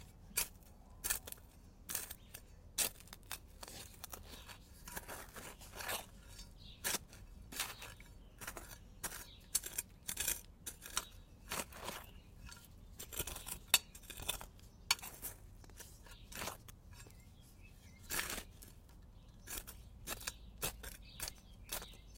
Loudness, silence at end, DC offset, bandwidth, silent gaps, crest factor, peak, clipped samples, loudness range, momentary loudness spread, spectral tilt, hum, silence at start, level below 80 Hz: -43 LUFS; 0 s; under 0.1%; 17 kHz; none; 36 dB; -10 dBFS; under 0.1%; 8 LU; 20 LU; -1 dB/octave; none; 0 s; -58 dBFS